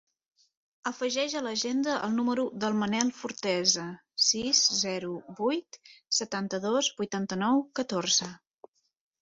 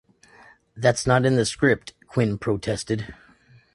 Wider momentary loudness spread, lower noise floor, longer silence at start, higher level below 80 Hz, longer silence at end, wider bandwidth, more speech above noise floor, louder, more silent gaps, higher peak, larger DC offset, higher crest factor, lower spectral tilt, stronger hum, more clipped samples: about the same, 9 LU vs 10 LU; about the same, -58 dBFS vs -55 dBFS; about the same, 0.85 s vs 0.75 s; second, -72 dBFS vs -50 dBFS; first, 0.85 s vs 0.6 s; second, 8 kHz vs 11.5 kHz; second, 28 dB vs 33 dB; second, -28 LUFS vs -23 LUFS; neither; second, -8 dBFS vs -4 dBFS; neither; about the same, 22 dB vs 20 dB; second, -2.5 dB/octave vs -5.5 dB/octave; neither; neither